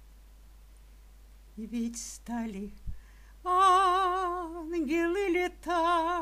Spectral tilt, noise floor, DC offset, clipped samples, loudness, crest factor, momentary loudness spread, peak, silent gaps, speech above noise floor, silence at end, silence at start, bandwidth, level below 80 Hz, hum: -4 dB/octave; -53 dBFS; under 0.1%; under 0.1%; -29 LUFS; 18 dB; 18 LU; -14 dBFS; none; 22 dB; 0 s; 0 s; 15.5 kHz; -50 dBFS; none